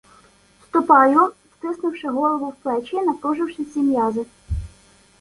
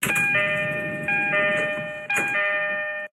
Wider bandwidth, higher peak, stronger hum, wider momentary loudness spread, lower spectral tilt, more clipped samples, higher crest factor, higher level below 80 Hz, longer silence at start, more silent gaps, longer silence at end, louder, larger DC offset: second, 11.5 kHz vs 16.5 kHz; first, -2 dBFS vs -8 dBFS; neither; first, 17 LU vs 7 LU; first, -7.5 dB/octave vs -3.5 dB/octave; neither; about the same, 20 dB vs 16 dB; first, -40 dBFS vs -62 dBFS; first, 0.75 s vs 0 s; neither; first, 0.55 s vs 0.05 s; about the same, -20 LUFS vs -22 LUFS; neither